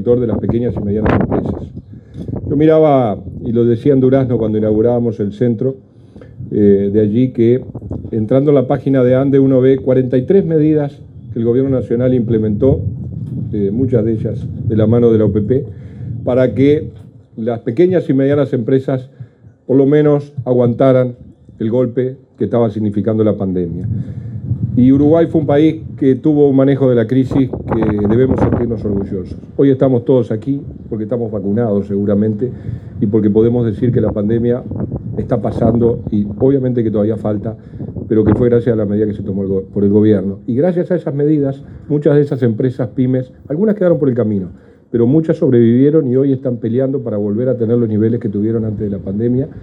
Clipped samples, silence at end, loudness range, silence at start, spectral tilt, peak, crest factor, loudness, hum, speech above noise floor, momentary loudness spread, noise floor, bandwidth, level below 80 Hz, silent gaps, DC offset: under 0.1%; 0 s; 3 LU; 0 s; -11 dB/octave; 0 dBFS; 14 dB; -14 LUFS; none; 25 dB; 11 LU; -38 dBFS; 5.2 kHz; -38 dBFS; none; under 0.1%